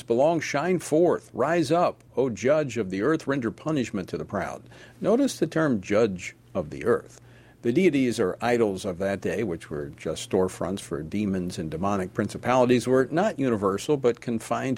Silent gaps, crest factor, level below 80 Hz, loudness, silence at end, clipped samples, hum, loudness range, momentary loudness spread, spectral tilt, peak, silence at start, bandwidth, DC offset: none; 18 dB; -56 dBFS; -26 LUFS; 0 s; under 0.1%; none; 3 LU; 9 LU; -6 dB/octave; -6 dBFS; 0.1 s; 16 kHz; under 0.1%